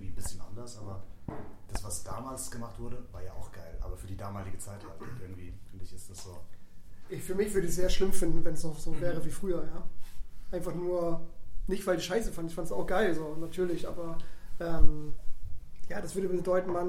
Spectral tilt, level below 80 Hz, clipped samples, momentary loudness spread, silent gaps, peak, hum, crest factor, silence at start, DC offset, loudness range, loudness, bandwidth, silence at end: -5 dB/octave; -38 dBFS; under 0.1%; 18 LU; none; -4 dBFS; none; 22 dB; 0 s; under 0.1%; 11 LU; -36 LUFS; 14.5 kHz; 0 s